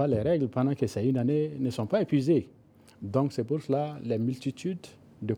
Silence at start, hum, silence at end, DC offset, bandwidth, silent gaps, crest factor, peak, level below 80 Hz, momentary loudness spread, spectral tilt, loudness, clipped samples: 0 s; none; 0 s; under 0.1%; 12.5 kHz; none; 16 dB; -12 dBFS; -62 dBFS; 10 LU; -8 dB/octave; -29 LUFS; under 0.1%